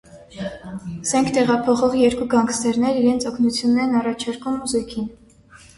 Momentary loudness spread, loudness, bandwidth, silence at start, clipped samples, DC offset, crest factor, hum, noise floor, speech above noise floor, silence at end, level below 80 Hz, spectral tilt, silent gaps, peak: 14 LU; -20 LUFS; 11.5 kHz; 0.15 s; under 0.1%; under 0.1%; 16 dB; none; -48 dBFS; 28 dB; 0.2 s; -50 dBFS; -4.5 dB/octave; none; -4 dBFS